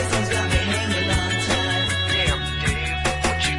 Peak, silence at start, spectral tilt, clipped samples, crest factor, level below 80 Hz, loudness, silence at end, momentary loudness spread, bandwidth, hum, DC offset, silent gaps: -8 dBFS; 0 s; -3.5 dB/octave; under 0.1%; 14 dB; -32 dBFS; -21 LUFS; 0 s; 3 LU; 11.5 kHz; none; under 0.1%; none